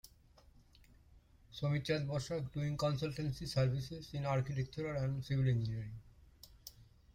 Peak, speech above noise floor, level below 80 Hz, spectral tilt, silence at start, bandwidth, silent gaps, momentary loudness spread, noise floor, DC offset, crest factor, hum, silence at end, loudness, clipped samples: -22 dBFS; 28 dB; -60 dBFS; -6.5 dB/octave; 0.05 s; 16 kHz; none; 18 LU; -64 dBFS; under 0.1%; 16 dB; none; 0 s; -38 LUFS; under 0.1%